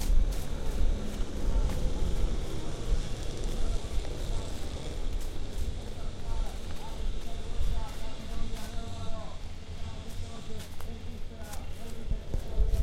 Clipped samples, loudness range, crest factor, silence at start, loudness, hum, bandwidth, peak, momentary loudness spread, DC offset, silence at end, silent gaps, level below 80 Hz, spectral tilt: under 0.1%; 7 LU; 14 dB; 0 s; -38 LUFS; none; 13.5 kHz; -14 dBFS; 9 LU; under 0.1%; 0 s; none; -32 dBFS; -5.5 dB/octave